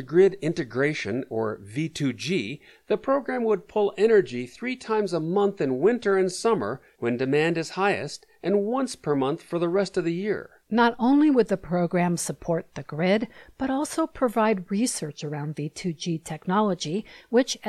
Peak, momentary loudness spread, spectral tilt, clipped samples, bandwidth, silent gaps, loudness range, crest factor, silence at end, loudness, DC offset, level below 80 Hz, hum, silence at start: -8 dBFS; 11 LU; -5.5 dB/octave; under 0.1%; 13.5 kHz; none; 3 LU; 16 dB; 0 s; -25 LUFS; under 0.1%; -60 dBFS; none; 0 s